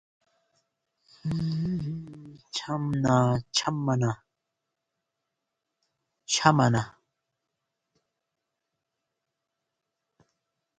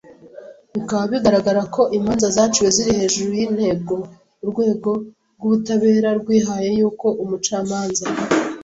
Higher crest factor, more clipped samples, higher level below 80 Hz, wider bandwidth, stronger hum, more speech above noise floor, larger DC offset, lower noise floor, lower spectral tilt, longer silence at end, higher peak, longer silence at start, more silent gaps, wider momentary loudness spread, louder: first, 28 dB vs 16 dB; neither; second, -60 dBFS vs -50 dBFS; first, 9.4 kHz vs 8 kHz; neither; first, 59 dB vs 22 dB; neither; first, -84 dBFS vs -40 dBFS; about the same, -5 dB/octave vs -4.5 dB/octave; first, 3.9 s vs 0 s; about the same, -4 dBFS vs -2 dBFS; first, 1.25 s vs 0.1 s; neither; first, 18 LU vs 10 LU; second, -27 LUFS vs -19 LUFS